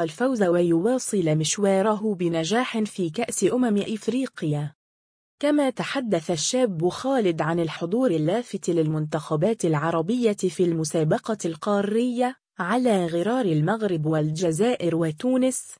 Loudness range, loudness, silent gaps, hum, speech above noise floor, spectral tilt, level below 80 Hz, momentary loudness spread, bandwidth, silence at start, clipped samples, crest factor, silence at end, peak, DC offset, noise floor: 2 LU; -24 LUFS; 4.75-5.38 s; none; over 67 dB; -5.5 dB/octave; -66 dBFS; 6 LU; 10.5 kHz; 0 s; under 0.1%; 14 dB; 0.05 s; -10 dBFS; under 0.1%; under -90 dBFS